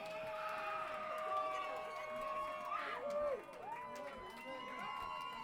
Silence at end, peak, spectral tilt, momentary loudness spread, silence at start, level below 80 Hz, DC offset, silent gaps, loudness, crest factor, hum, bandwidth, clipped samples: 0 s; -28 dBFS; -3.5 dB/octave; 8 LU; 0 s; -72 dBFS; under 0.1%; none; -44 LUFS; 16 dB; none; 18 kHz; under 0.1%